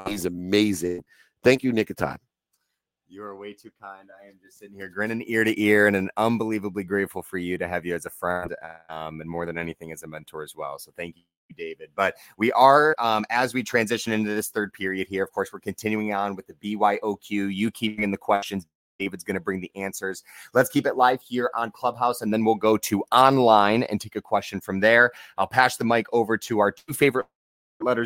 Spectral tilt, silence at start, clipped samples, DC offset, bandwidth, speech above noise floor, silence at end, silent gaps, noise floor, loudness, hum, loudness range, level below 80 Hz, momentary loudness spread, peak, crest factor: -5 dB/octave; 0 s; under 0.1%; under 0.1%; 17 kHz; 56 dB; 0 s; 11.37-11.49 s, 18.75-18.99 s, 27.35-27.80 s; -80 dBFS; -23 LUFS; none; 11 LU; -62 dBFS; 19 LU; -2 dBFS; 22 dB